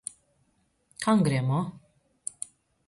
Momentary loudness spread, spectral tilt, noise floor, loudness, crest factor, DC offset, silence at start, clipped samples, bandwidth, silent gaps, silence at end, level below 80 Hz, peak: 17 LU; -6 dB/octave; -70 dBFS; -28 LUFS; 18 dB; under 0.1%; 1 s; under 0.1%; 11.5 kHz; none; 1.1 s; -64 dBFS; -12 dBFS